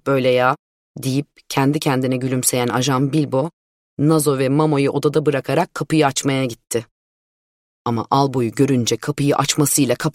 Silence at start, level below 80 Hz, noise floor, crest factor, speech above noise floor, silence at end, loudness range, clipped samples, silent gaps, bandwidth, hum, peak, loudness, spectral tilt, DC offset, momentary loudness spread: 0.05 s; -56 dBFS; under -90 dBFS; 18 dB; over 72 dB; 0.05 s; 3 LU; under 0.1%; 0.59-0.95 s, 3.53-3.97 s, 6.91-7.85 s; 16.5 kHz; none; -2 dBFS; -18 LUFS; -5 dB/octave; under 0.1%; 8 LU